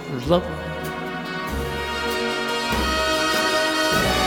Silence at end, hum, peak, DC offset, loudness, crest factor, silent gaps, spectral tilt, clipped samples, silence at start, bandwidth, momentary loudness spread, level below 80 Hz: 0 s; none; -2 dBFS; under 0.1%; -22 LUFS; 20 dB; none; -3.5 dB/octave; under 0.1%; 0 s; over 20 kHz; 9 LU; -36 dBFS